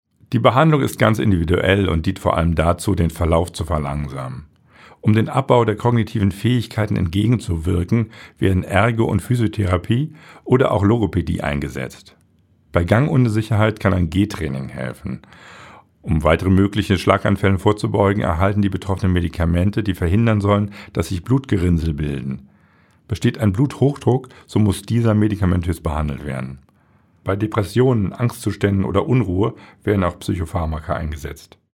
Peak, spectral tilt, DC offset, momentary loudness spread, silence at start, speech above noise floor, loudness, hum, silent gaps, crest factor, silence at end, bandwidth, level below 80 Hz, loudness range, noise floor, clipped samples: 0 dBFS; -7.5 dB/octave; under 0.1%; 11 LU; 0.3 s; 39 dB; -19 LUFS; none; none; 18 dB; 0.35 s; 15.5 kHz; -34 dBFS; 3 LU; -56 dBFS; under 0.1%